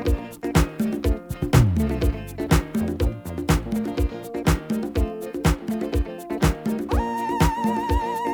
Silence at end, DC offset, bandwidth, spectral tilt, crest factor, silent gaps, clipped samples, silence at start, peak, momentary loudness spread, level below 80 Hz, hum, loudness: 0 s; under 0.1%; over 20 kHz; -6.5 dB/octave; 18 dB; none; under 0.1%; 0 s; -4 dBFS; 6 LU; -28 dBFS; none; -24 LUFS